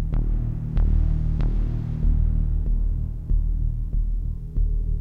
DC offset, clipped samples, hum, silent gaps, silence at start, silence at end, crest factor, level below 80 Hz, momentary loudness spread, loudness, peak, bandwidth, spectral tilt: under 0.1%; under 0.1%; none; none; 0 s; 0 s; 12 dB; -22 dBFS; 5 LU; -26 LUFS; -10 dBFS; 2.1 kHz; -10.5 dB/octave